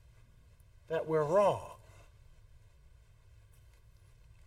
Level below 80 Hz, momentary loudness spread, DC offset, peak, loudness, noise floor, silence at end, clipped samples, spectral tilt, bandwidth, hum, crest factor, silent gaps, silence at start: -62 dBFS; 22 LU; under 0.1%; -18 dBFS; -32 LUFS; -60 dBFS; 2.7 s; under 0.1%; -6.5 dB/octave; 14 kHz; none; 20 dB; none; 0.9 s